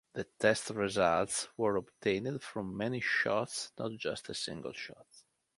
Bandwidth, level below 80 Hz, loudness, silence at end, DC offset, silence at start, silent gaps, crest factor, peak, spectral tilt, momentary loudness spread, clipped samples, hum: 11.5 kHz; -66 dBFS; -34 LUFS; 0.4 s; under 0.1%; 0.15 s; none; 22 dB; -12 dBFS; -4 dB/octave; 11 LU; under 0.1%; none